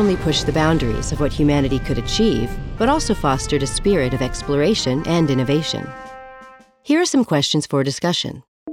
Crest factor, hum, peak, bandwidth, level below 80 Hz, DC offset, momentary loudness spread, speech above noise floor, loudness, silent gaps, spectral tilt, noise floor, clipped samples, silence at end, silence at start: 16 dB; none; -2 dBFS; 16 kHz; -32 dBFS; under 0.1%; 10 LU; 26 dB; -19 LUFS; 8.48-8.66 s; -5 dB/octave; -44 dBFS; under 0.1%; 0 s; 0 s